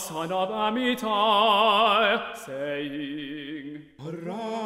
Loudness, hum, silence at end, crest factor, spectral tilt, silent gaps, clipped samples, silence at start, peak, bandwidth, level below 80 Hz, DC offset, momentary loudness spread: -24 LUFS; none; 0 s; 18 dB; -3.5 dB/octave; none; under 0.1%; 0 s; -8 dBFS; 16 kHz; -66 dBFS; under 0.1%; 17 LU